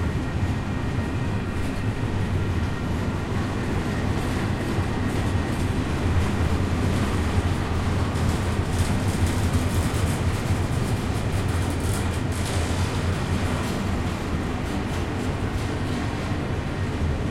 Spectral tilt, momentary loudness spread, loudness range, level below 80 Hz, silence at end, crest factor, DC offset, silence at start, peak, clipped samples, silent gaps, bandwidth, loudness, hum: -6 dB/octave; 3 LU; 2 LU; -34 dBFS; 0 s; 14 dB; under 0.1%; 0 s; -10 dBFS; under 0.1%; none; 16 kHz; -25 LUFS; none